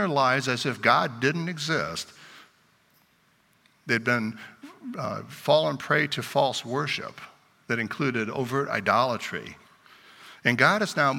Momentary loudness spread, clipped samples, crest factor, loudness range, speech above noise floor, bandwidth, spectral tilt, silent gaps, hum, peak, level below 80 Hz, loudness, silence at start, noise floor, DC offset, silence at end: 16 LU; under 0.1%; 24 dB; 5 LU; 39 dB; 17 kHz; -4.5 dB/octave; none; none; -4 dBFS; -70 dBFS; -25 LUFS; 0 s; -64 dBFS; under 0.1%; 0 s